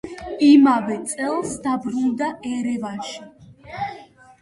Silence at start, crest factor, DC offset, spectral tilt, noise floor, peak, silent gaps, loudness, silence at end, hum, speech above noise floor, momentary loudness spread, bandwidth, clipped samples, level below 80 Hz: 0.05 s; 18 dB; under 0.1%; -4.5 dB/octave; -43 dBFS; -4 dBFS; none; -20 LUFS; 0.35 s; none; 24 dB; 18 LU; 11.5 kHz; under 0.1%; -56 dBFS